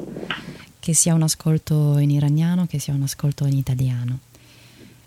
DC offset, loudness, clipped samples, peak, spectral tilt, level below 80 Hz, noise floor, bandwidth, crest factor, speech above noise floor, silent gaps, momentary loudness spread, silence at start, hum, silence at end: under 0.1%; -21 LUFS; under 0.1%; -4 dBFS; -5 dB/octave; -50 dBFS; -48 dBFS; 15.5 kHz; 18 dB; 29 dB; none; 12 LU; 0 s; none; 0.25 s